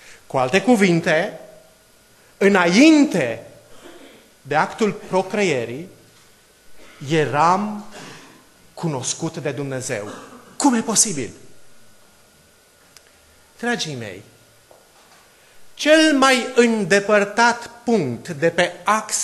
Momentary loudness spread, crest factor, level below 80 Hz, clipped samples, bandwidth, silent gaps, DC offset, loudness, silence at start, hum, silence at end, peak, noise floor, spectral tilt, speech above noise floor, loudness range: 19 LU; 20 dB; -62 dBFS; under 0.1%; 13 kHz; none; under 0.1%; -18 LUFS; 0.1 s; none; 0 s; -2 dBFS; -53 dBFS; -4 dB/octave; 35 dB; 14 LU